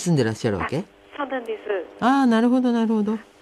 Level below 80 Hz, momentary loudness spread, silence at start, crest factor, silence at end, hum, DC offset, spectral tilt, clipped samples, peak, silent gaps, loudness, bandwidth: -56 dBFS; 11 LU; 0 s; 14 dB; 0.2 s; none; under 0.1%; -6.5 dB/octave; under 0.1%; -8 dBFS; none; -22 LUFS; 12 kHz